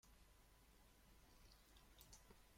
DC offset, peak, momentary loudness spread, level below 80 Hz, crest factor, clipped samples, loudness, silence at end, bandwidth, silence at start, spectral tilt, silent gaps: under 0.1%; -46 dBFS; 4 LU; -72 dBFS; 22 dB; under 0.1%; -68 LUFS; 0 s; 16.5 kHz; 0.05 s; -3 dB/octave; none